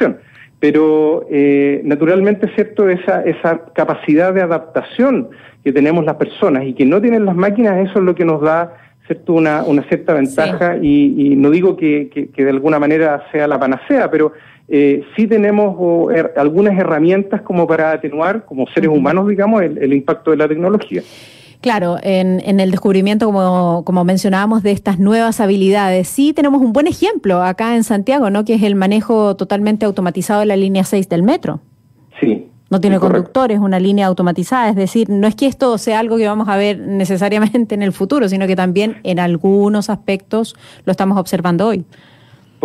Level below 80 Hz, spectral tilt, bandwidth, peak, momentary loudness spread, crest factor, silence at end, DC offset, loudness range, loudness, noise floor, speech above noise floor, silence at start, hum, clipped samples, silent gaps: -52 dBFS; -7 dB/octave; 14 kHz; -2 dBFS; 6 LU; 10 dB; 0.8 s; under 0.1%; 2 LU; -14 LUFS; -45 dBFS; 32 dB; 0 s; none; under 0.1%; none